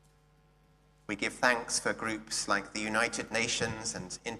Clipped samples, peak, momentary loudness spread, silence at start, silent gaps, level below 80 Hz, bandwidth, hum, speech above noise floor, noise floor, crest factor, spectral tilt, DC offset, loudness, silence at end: under 0.1%; -10 dBFS; 8 LU; 1.1 s; none; -62 dBFS; 14.5 kHz; none; 32 dB; -65 dBFS; 24 dB; -2 dB/octave; under 0.1%; -31 LUFS; 0 s